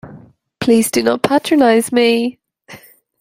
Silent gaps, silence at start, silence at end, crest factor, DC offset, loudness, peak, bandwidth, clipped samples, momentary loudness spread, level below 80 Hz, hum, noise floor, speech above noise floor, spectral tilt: none; 0.05 s; 0.45 s; 14 dB; under 0.1%; -14 LUFS; 0 dBFS; 16 kHz; under 0.1%; 7 LU; -56 dBFS; none; -42 dBFS; 29 dB; -4 dB/octave